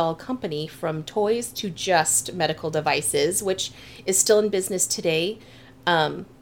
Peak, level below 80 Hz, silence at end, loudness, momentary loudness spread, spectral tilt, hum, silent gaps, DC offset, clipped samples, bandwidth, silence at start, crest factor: -4 dBFS; -58 dBFS; 0.15 s; -23 LUFS; 11 LU; -2.5 dB/octave; none; none; 0.1%; under 0.1%; 19 kHz; 0 s; 20 dB